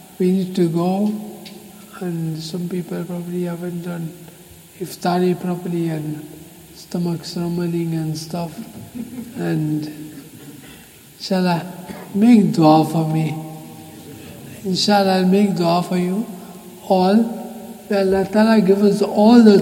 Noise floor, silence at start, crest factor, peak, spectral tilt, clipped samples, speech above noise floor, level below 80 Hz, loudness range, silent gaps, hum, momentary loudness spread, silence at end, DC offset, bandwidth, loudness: -43 dBFS; 0.2 s; 18 dB; 0 dBFS; -6.5 dB/octave; under 0.1%; 26 dB; -58 dBFS; 9 LU; none; none; 23 LU; 0 s; under 0.1%; 17 kHz; -18 LUFS